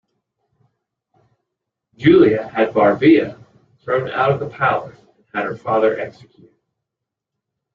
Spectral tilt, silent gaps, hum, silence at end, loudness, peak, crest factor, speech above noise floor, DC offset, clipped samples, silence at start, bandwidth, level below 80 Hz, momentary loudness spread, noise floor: -8.5 dB/octave; none; none; 1.65 s; -17 LUFS; -2 dBFS; 18 dB; 66 dB; under 0.1%; under 0.1%; 2 s; 5.4 kHz; -58 dBFS; 16 LU; -83 dBFS